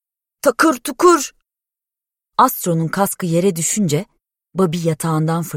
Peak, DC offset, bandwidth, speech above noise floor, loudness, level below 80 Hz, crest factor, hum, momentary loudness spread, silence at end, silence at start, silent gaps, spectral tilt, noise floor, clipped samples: -2 dBFS; under 0.1%; 16.5 kHz; 71 dB; -17 LUFS; -56 dBFS; 16 dB; none; 7 LU; 0 s; 0.45 s; none; -5 dB/octave; -88 dBFS; under 0.1%